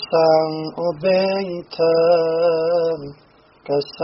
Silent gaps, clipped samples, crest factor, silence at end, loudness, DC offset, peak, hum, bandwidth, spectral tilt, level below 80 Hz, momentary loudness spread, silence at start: none; under 0.1%; 14 dB; 0 s; -19 LUFS; under 0.1%; -4 dBFS; none; 6 kHz; -4 dB/octave; -60 dBFS; 9 LU; 0 s